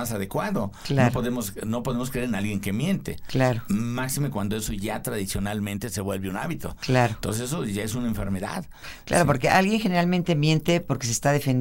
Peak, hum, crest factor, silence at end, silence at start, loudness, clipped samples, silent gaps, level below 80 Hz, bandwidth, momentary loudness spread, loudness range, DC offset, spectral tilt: -6 dBFS; none; 20 dB; 0 s; 0 s; -25 LUFS; under 0.1%; none; -44 dBFS; 16.5 kHz; 8 LU; 4 LU; under 0.1%; -5.5 dB/octave